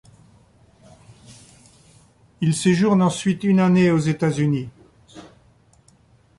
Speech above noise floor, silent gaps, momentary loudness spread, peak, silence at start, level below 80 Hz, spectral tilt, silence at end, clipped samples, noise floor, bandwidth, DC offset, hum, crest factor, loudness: 38 dB; none; 8 LU; -6 dBFS; 1.3 s; -56 dBFS; -6.5 dB/octave; 1.15 s; under 0.1%; -56 dBFS; 11.5 kHz; under 0.1%; none; 16 dB; -19 LUFS